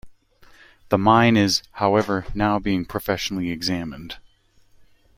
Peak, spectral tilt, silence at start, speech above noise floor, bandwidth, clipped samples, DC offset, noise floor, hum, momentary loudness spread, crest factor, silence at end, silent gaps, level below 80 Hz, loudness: -2 dBFS; -5 dB/octave; 0.05 s; 36 dB; 16.5 kHz; under 0.1%; under 0.1%; -57 dBFS; none; 15 LU; 20 dB; 0.95 s; none; -46 dBFS; -21 LUFS